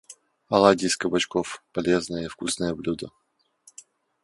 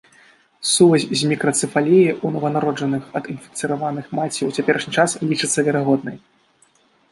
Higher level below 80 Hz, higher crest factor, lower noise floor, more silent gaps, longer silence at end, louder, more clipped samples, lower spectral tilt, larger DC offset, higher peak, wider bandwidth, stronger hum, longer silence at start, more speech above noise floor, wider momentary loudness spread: first, -56 dBFS vs -64 dBFS; first, 24 dB vs 18 dB; about the same, -59 dBFS vs -58 dBFS; neither; first, 1.15 s vs 0.95 s; second, -24 LUFS vs -19 LUFS; neither; about the same, -4 dB/octave vs -4.5 dB/octave; neither; about the same, -2 dBFS vs -2 dBFS; about the same, 11.5 kHz vs 11.5 kHz; neither; second, 0.1 s vs 0.6 s; second, 35 dB vs 39 dB; about the same, 13 LU vs 11 LU